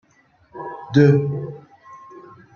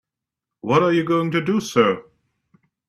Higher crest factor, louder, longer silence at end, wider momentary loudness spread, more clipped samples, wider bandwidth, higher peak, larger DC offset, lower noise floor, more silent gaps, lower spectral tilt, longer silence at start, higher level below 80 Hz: about the same, 20 dB vs 20 dB; about the same, -18 LUFS vs -20 LUFS; second, 0.35 s vs 0.85 s; first, 25 LU vs 7 LU; neither; second, 6.8 kHz vs 13.5 kHz; about the same, -2 dBFS vs 0 dBFS; neither; second, -58 dBFS vs -85 dBFS; neither; first, -9 dB/octave vs -6 dB/octave; about the same, 0.55 s vs 0.65 s; about the same, -60 dBFS vs -62 dBFS